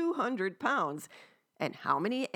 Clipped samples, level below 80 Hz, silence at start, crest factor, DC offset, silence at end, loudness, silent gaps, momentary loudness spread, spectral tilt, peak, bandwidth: under 0.1%; -90 dBFS; 0 s; 18 dB; under 0.1%; 0.05 s; -33 LUFS; none; 9 LU; -5 dB/octave; -14 dBFS; 18 kHz